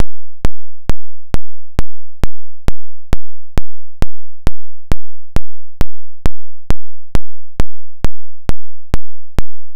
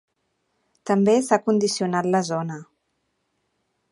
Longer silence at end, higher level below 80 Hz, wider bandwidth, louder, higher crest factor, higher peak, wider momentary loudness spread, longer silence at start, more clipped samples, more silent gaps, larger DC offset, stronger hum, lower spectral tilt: second, 0 s vs 1.3 s; first, -22 dBFS vs -72 dBFS; second, 9.6 kHz vs 11.5 kHz; second, -26 LUFS vs -21 LUFS; second, 6 dB vs 22 dB; about the same, 0 dBFS vs -2 dBFS; second, 0 LU vs 14 LU; second, 0 s vs 0.85 s; first, 2% vs under 0.1%; neither; first, 50% vs under 0.1%; neither; about the same, -6.5 dB/octave vs -5.5 dB/octave